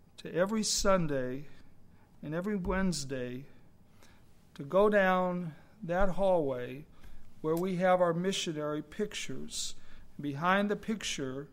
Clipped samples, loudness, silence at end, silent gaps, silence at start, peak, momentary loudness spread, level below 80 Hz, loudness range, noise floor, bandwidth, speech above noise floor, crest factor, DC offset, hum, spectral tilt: under 0.1%; -32 LUFS; 0 s; none; 0.2 s; -14 dBFS; 14 LU; -48 dBFS; 5 LU; -57 dBFS; 16 kHz; 26 dB; 18 dB; under 0.1%; none; -4.5 dB/octave